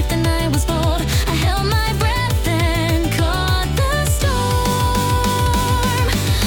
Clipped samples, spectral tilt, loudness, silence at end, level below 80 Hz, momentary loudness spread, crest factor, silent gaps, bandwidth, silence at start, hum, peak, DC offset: under 0.1%; -4.5 dB/octave; -18 LUFS; 0 s; -22 dBFS; 1 LU; 12 dB; none; 18 kHz; 0 s; none; -4 dBFS; under 0.1%